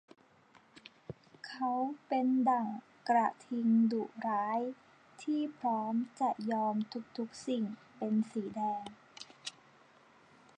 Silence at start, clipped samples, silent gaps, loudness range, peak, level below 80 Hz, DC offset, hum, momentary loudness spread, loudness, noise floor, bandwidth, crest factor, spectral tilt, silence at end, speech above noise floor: 0.75 s; under 0.1%; none; 6 LU; -18 dBFS; -82 dBFS; under 0.1%; none; 19 LU; -34 LUFS; -64 dBFS; 9.8 kHz; 18 dB; -6 dB/octave; 1.05 s; 31 dB